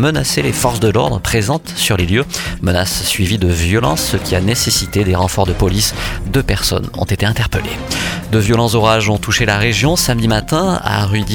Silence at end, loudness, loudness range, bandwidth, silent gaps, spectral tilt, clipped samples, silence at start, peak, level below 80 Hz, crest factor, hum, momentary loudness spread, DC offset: 0 s; -14 LUFS; 2 LU; 19 kHz; none; -4.5 dB/octave; under 0.1%; 0 s; 0 dBFS; -28 dBFS; 14 dB; none; 6 LU; under 0.1%